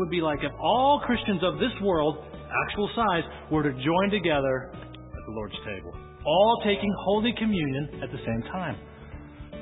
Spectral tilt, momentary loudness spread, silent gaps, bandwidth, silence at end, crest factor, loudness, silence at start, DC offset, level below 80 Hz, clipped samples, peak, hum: -10.5 dB/octave; 19 LU; none; 4 kHz; 0 s; 18 dB; -26 LUFS; 0 s; under 0.1%; -46 dBFS; under 0.1%; -10 dBFS; none